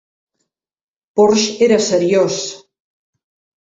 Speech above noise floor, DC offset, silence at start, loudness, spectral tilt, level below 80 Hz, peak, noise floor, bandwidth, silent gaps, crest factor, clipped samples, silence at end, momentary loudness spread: 60 dB; under 0.1%; 1.15 s; -14 LUFS; -4 dB/octave; -60 dBFS; -2 dBFS; -73 dBFS; 8 kHz; none; 16 dB; under 0.1%; 1.05 s; 10 LU